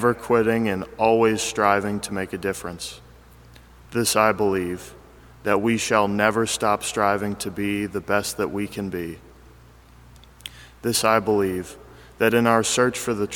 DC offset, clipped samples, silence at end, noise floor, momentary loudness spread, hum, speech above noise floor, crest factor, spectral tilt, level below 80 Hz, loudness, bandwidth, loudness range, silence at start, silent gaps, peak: under 0.1%; under 0.1%; 0 s; -49 dBFS; 14 LU; none; 27 dB; 22 dB; -4 dB/octave; -52 dBFS; -22 LUFS; 19 kHz; 5 LU; 0 s; none; -2 dBFS